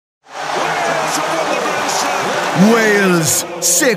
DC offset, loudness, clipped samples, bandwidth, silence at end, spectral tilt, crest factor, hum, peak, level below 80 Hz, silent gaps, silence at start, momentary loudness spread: under 0.1%; -14 LUFS; under 0.1%; 16 kHz; 0 s; -3 dB/octave; 14 dB; none; 0 dBFS; -60 dBFS; none; 0.3 s; 7 LU